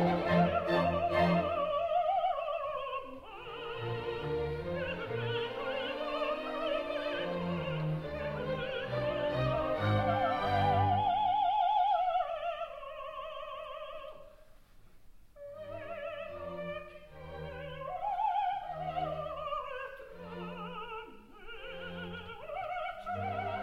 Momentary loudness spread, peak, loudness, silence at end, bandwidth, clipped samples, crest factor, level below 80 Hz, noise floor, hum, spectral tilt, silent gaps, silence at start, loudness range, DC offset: 16 LU; -16 dBFS; -34 LUFS; 0 s; 13 kHz; under 0.1%; 18 dB; -56 dBFS; -56 dBFS; none; -7.5 dB/octave; none; 0 s; 14 LU; under 0.1%